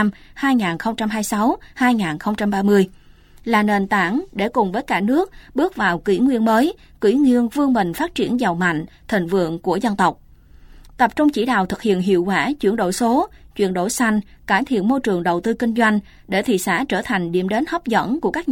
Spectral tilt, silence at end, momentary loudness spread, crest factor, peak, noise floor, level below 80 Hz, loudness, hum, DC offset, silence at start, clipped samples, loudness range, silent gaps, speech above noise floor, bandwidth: -5.5 dB/octave; 0 s; 6 LU; 16 dB; -4 dBFS; -45 dBFS; -48 dBFS; -19 LUFS; none; under 0.1%; 0 s; under 0.1%; 2 LU; none; 26 dB; 17 kHz